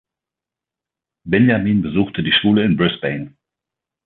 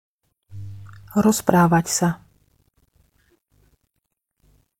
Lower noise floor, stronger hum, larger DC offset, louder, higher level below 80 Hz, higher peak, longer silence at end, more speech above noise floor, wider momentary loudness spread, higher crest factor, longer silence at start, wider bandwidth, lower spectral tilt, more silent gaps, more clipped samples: first, -87 dBFS vs -77 dBFS; neither; neither; first, -16 LUFS vs -19 LUFS; about the same, -48 dBFS vs -52 dBFS; about the same, -2 dBFS vs 0 dBFS; second, 0.75 s vs 2.65 s; first, 71 dB vs 59 dB; second, 10 LU vs 22 LU; second, 16 dB vs 24 dB; first, 1.25 s vs 0.55 s; second, 4.3 kHz vs 17 kHz; first, -10 dB/octave vs -5.5 dB/octave; neither; neither